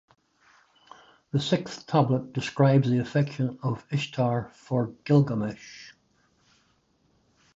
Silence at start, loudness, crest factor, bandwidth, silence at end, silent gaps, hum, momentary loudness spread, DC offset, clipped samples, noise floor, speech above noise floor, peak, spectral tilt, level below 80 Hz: 1.35 s; -26 LUFS; 20 dB; 7.8 kHz; 1.65 s; none; none; 10 LU; under 0.1%; under 0.1%; -67 dBFS; 42 dB; -8 dBFS; -7.5 dB/octave; -64 dBFS